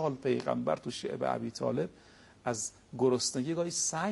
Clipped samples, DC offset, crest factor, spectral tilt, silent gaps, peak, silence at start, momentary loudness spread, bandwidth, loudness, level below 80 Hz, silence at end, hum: under 0.1%; under 0.1%; 18 dB; -4 dB/octave; none; -16 dBFS; 0 s; 8 LU; 11.5 kHz; -33 LUFS; -68 dBFS; 0 s; none